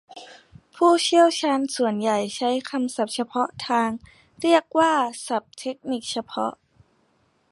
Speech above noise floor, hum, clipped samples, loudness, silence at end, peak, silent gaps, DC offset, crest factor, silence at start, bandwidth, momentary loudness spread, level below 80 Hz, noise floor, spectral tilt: 43 dB; none; under 0.1%; -23 LUFS; 1 s; -4 dBFS; none; under 0.1%; 20 dB; 0.1 s; 11.5 kHz; 12 LU; -66 dBFS; -65 dBFS; -3.5 dB/octave